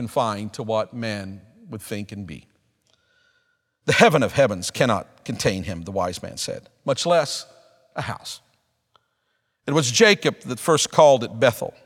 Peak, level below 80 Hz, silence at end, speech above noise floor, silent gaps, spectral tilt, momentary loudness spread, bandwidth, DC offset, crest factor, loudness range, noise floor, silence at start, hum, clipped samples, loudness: 0 dBFS; -56 dBFS; 0.15 s; 51 dB; none; -4 dB/octave; 20 LU; 17 kHz; under 0.1%; 22 dB; 9 LU; -73 dBFS; 0 s; none; under 0.1%; -21 LUFS